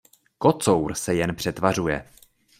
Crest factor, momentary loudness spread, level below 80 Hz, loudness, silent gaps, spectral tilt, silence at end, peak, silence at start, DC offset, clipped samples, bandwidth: 20 dB; 6 LU; -50 dBFS; -23 LUFS; none; -5 dB/octave; 0.55 s; -4 dBFS; 0.4 s; under 0.1%; under 0.1%; 16 kHz